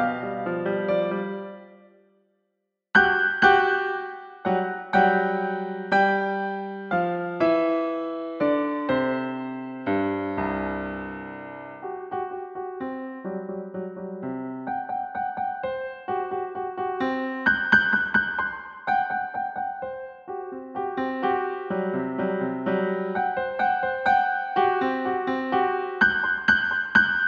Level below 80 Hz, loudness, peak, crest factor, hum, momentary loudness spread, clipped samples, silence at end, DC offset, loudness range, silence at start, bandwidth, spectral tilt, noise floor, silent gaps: -58 dBFS; -25 LUFS; -4 dBFS; 22 dB; none; 14 LU; under 0.1%; 0 s; under 0.1%; 9 LU; 0 s; 7 kHz; -6.5 dB/octave; -78 dBFS; none